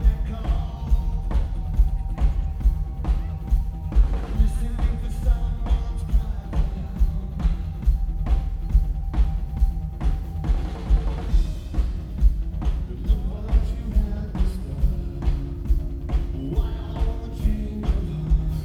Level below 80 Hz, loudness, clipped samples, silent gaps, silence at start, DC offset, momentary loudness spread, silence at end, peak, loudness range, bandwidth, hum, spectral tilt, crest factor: -22 dBFS; -26 LUFS; under 0.1%; none; 0 s; under 0.1%; 4 LU; 0 s; -6 dBFS; 2 LU; 5.4 kHz; none; -8 dB/octave; 16 dB